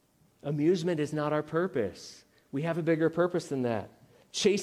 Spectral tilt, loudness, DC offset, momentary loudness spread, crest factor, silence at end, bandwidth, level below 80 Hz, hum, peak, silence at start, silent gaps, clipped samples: -5.5 dB/octave; -30 LUFS; under 0.1%; 12 LU; 18 dB; 0 s; 13.5 kHz; -70 dBFS; none; -12 dBFS; 0.45 s; none; under 0.1%